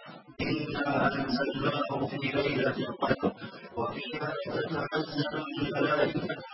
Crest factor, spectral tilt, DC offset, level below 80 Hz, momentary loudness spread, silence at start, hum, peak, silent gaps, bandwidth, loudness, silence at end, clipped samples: 20 dB; -9.5 dB/octave; under 0.1%; -58 dBFS; 7 LU; 0 s; none; -10 dBFS; none; 5.8 kHz; -31 LUFS; 0 s; under 0.1%